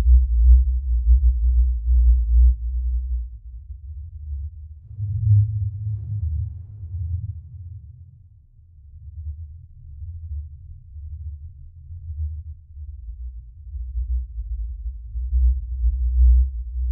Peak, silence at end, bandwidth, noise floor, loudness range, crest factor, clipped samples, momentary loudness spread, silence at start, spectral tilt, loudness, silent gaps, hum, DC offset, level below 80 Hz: -4 dBFS; 0 s; 0.2 kHz; -50 dBFS; 16 LU; 16 dB; under 0.1%; 22 LU; 0 s; -20.5 dB/octave; -23 LUFS; none; none; under 0.1%; -22 dBFS